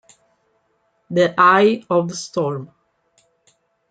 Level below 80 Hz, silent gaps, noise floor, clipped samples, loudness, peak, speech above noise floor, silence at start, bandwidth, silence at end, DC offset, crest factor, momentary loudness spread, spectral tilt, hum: -68 dBFS; none; -66 dBFS; under 0.1%; -17 LUFS; 0 dBFS; 49 dB; 1.1 s; 9.2 kHz; 1.25 s; under 0.1%; 20 dB; 12 LU; -5 dB/octave; none